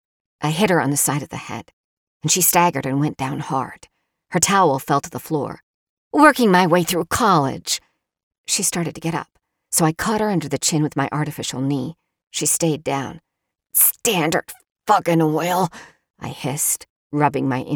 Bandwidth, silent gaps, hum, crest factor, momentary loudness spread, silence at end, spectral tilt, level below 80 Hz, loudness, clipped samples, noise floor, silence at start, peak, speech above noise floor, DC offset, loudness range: over 20 kHz; 1.73-2.21 s, 5.63-6.11 s, 8.23-8.31 s, 8.38-8.44 s, 16.10-16.14 s, 16.90-17.10 s; none; 20 dB; 15 LU; 0 s; -4 dB/octave; -54 dBFS; -19 LUFS; under 0.1%; -48 dBFS; 0.4 s; 0 dBFS; 29 dB; under 0.1%; 4 LU